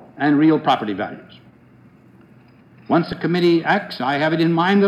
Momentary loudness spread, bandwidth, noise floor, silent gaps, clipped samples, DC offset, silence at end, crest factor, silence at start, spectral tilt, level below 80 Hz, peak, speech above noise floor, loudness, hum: 10 LU; 8 kHz; -49 dBFS; none; under 0.1%; under 0.1%; 0 s; 16 dB; 0.15 s; -7.5 dB/octave; -58 dBFS; -4 dBFS; 31 dB; -18 LUFS; none